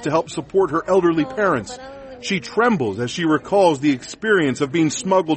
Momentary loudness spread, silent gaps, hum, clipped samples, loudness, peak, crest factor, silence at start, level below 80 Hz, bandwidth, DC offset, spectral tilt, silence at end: 8 LU; none; none; under 0.1%; -19 LUFS; -4 dBFS; 16 dB; 0 s; -54 dBFS; 8.8 kHz; under 0.1%; -5 dB/octave; 0 s